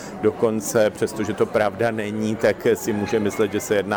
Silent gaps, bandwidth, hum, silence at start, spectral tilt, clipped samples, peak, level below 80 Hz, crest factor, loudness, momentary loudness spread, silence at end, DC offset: none; over 20 kHz; none; 0 s; -5 dB/octave; under 0.1%; -6 dBFS; -54 dBFS; 16 dB; -22 LUFS; 4 LU; 0 s; under 0.1%